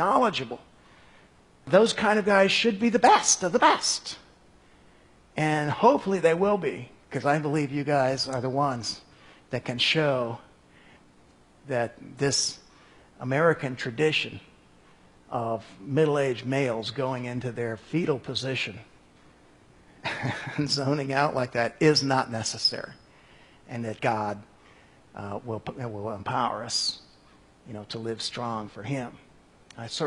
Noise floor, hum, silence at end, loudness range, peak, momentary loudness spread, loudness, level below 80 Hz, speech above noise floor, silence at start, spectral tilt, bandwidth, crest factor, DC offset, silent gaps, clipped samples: -57 dBFS; none; 0 s; 9 LU; -4 dBFS; 17 LU; -26 LUFS; -64 dBFS; 31 dB; 0 s; -4 dB/octave; 11.5 kHz; 22 dB; under 0.1%; none; under 0.1%